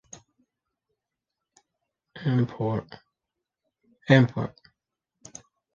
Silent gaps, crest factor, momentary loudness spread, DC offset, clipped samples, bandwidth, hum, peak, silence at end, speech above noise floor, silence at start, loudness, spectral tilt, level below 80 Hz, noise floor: none; 28 dB; 26 LU; under 0.1%; under 0.1%; 7.4 kHz; none; -2 dBFS; 1.25 s; 63 dB; 2.15 s; -25 LUFS; -7 dB/octave; -64 dBFS; -86 dBFS